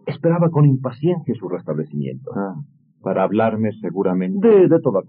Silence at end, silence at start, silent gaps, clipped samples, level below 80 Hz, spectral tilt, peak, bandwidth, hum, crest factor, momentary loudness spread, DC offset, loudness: 0.05 s; 0.05 s; none; under 0.1%; -70 dBFS; -9 dB/octave; -4 dBFS; 4.5 kHz; none; 14 dB; 14 LU; under 0.1%; -19 LUFS